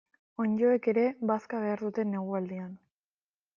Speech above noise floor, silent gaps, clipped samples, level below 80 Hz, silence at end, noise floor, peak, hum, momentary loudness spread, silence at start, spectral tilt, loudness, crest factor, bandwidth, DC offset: over 61 dB; none; under 0.1%; -78 dBFS; 0.8 s; under -90 dBFS; -16 dBFS; none; 13 LU; 0.4 s; -9.5 dB/octave; -30 LUFS; 16 dB; 7 kHz; under 0.1%